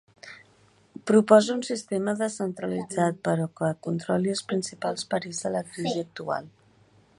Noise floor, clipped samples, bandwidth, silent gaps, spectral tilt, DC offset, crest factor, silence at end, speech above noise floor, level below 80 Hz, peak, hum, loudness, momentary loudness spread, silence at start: -60 dBFS; under 0.1%; 11.5 kHz; none; -5.5 dB/octave; under 0.1%; 22 dB; 0.7 s; 34 dB; -70 dBFS; -4 dBFS; none; -26 LUFS; 13 LU; 0.25 s